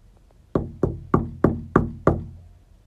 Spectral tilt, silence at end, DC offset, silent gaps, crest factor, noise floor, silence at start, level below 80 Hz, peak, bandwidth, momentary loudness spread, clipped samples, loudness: -10 dB/octave; 0.45 s; under 0.1%; none; 24 dB; -53 dBFS; 0.55 s; -38 dBFS; 0 dBFS; 8 kHz; 8 LU; under 0.1%; -24 LUFS